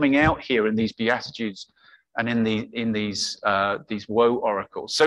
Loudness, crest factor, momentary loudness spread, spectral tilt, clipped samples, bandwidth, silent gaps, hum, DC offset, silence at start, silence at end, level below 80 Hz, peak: -24 LUFS; 18 dB; 11 LU; -4.5 dB/octave; under 0.1%; 12 kHz; none; none; under 0.1%; 0 s; 0 s; -50 dBFS; -6 dBFS